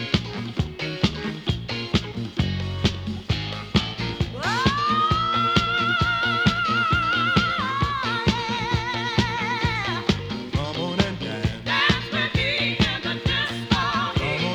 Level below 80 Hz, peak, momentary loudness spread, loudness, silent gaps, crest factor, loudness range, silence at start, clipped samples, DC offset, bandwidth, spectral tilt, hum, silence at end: -38 dBFS; -2 dBFS; 7 LU; -23 LUFS; none; 20 dB; 5 LU; 0 s; under 0.1%; under 0.1%; 13 kHz; -5 dB/octave; none; 0 s